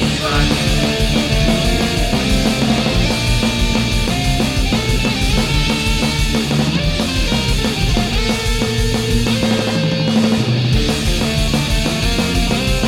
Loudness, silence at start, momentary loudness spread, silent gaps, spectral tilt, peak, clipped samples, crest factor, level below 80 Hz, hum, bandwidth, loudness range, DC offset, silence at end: -16 LUFS; 0 s; 2 LU; none; -4.5 dB/octave; 0 dBFS; under 0.1%; 14 dB; -22 dBFS; none; 16.5 kHz; 1 LU; under 0.1%; 0 s